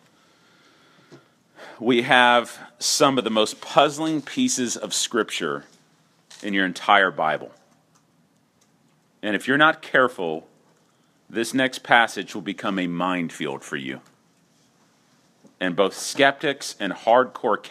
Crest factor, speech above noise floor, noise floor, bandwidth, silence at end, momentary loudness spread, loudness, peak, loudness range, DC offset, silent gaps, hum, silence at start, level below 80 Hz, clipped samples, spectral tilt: 24 dB; 41 dB; -62 dBFS; 15 kHz; 0 s; 13 LU; -21 LUFS; 0 dBFS; 6 LU; under 0.1%; none; none; 1.1 s; -76 dBFS; under 0.1%; -3 dB/octave